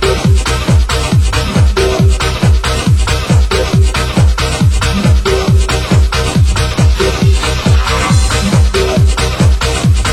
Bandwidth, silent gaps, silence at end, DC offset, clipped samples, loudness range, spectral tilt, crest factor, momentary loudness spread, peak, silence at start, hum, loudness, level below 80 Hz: 16 kHz; none; 0 s; 0.3%; under 0.1%; 0 LU; -5 dB/octave; 10 dB; 1 LU; 0 dBFS; 0 s; none; -11 LUFS; -14 dBFS